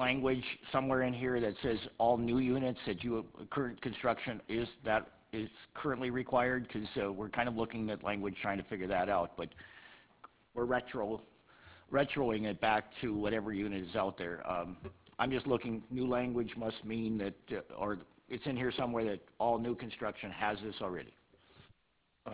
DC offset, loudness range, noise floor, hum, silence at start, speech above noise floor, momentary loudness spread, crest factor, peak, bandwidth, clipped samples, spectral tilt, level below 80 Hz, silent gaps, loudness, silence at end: under 0.1%; 4 LU; -76 dBFS; none; 0 s; 40 dB; 11 LU; 20 dB; -16 dBFS; 4 kHz; under 0.1%; -4.5 dB/octave; -60 dBFS; none; -36 LUFS; 0 s